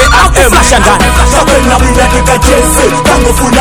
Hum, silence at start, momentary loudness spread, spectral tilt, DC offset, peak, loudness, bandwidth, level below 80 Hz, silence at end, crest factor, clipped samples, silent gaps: none; 0 s; 2 LU; -4 dB/octave; under 0.1%; 0 dBFS; -6 LUFS; over 20 kHz; -12 dBFS; 0 s; 6 dB; 9%; none